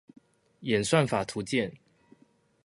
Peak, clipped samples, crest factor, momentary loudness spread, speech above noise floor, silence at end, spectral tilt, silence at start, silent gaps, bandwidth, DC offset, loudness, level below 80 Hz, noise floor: -8 dBFS; under 0.1%; 24 dB; 10 LU; 37 dB; 0.9 s; -5 dB/octave; 0.6 s; none; 11.5 kHz; under 0.1%; -28 LUFS; -62 dBFS; -64 dBFS